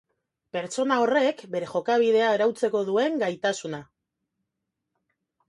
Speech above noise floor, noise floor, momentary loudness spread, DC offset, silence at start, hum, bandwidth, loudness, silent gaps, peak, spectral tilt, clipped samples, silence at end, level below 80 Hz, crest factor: 59 dB; -83 dBFS; 12 LU; under 0.1%; 0.55 s; none; 11.5 kHz; -24 LUFS; none; -10 dBFS; -4.5 dB/octave; under 0.1%; 1.65 s; -74 dBFS; 16 dB